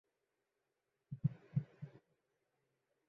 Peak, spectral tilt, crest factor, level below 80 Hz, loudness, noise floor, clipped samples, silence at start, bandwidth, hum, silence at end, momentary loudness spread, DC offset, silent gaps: -24 dBFS; -11.5 dB/octave; 24 dB; -76 dBFS; -43 LUFS; -88 dBFS; under 0.1%; 1.1 s; 3.7 kHz; none; 1.2 s; 15 LU; under 0.1%; none